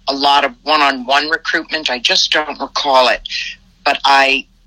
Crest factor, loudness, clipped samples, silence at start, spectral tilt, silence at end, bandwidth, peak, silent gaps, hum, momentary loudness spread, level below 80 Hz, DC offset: 14 dB; -13 LUFS; under 0.1%; 0.05 s; -0.5 dB/octave; 0.25 s; 16.5 kHz; 0 dBFS; none; none; 9 LU; -48 dBFS; under 0.1%